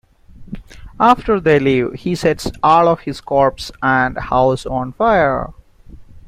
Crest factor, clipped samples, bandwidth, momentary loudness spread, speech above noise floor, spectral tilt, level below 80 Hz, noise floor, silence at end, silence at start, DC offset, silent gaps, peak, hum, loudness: 16 dB; under 0.1%; 15.5 kHz; 11 LU; 24 dB; -6 dB/octave; -38 dBFS; -39 dBFS; 0.05 s; 0.4 s; under 0.1%; none; 0 dBFS; none; -15 LUFS